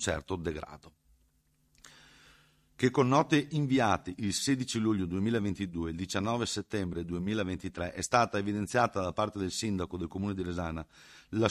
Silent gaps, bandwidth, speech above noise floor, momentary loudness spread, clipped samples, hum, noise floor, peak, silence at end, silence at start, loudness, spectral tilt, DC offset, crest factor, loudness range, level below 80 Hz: none; 14.5 kHz; 40 dB; 9 LU; under 0.1%; none; -71 dBFS; -10 dBFS; 0 s; 0 s; -31 LUFS; -5 dB/octave; under 0.1%; 22 dB; 4 LU; -52 dBFS